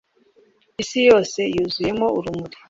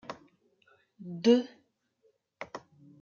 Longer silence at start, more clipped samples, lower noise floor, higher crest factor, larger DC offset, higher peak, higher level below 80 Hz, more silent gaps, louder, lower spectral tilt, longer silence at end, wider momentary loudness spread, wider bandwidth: first, 0.8 s vs 0.1 s; neither; second, -58 dBFS vs -72 dBFS; about the same, 18 dB vs 22 dB; neither; first, -2 dBFS vs -12 dBFS; first, -52 dBFS vs -82 dBFS; neither; first, -19 LUFS vs -27 LUFS; second, -4.5 dB/octave vs -6 dB/octave; second, 0.2 s vs 0.45 s; second, 15 LU vs 24 LU; about the same, 7.8 kHz vs 7.2 kHz